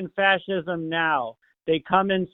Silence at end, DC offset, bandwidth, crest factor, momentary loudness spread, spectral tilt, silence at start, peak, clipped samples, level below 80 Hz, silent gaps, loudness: 0.05 s; under 0.1%; 4.1 kHz; 20 dB; 8 LU; -9 dB/octave; 0 s; -4 dBFS; under 0.1%; -60 dBFS; none; -23 LUFS